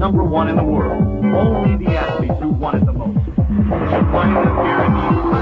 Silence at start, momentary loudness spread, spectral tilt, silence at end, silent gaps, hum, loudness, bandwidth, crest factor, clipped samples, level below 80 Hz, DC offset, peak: 0 s; 4 LU; -10 dB/octave; 0 s; none; none; -16 LUFS; 5.4 kHz; 12 dB; under 0.1%; -26 dBFS; under 0.1%; -2 dBFS